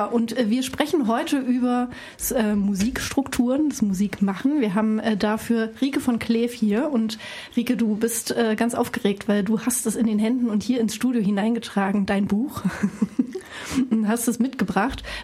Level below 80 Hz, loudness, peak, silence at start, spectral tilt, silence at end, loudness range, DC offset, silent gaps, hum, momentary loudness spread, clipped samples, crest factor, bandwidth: -50 dBFS; -23 LUFS; -6 dBFS; 0 s; -5 dB/octave; 0 s; 1 LU; under 0.1%; none; none; 4 LU; under 0.1%; 18 dB; 15.5 kHz